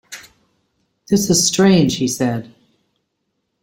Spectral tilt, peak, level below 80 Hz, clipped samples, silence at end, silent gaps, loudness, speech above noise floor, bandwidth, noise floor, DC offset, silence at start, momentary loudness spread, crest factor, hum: -4.5 dB/octave; -2 dBFS; -50 dBFS; under 0.1%; 1.2 s; none; -15 LUFS; 57 dB; 16.5 kHz; -72 dBFS; under 0.1%; 0.1 s; 18 LU; 18 dB; none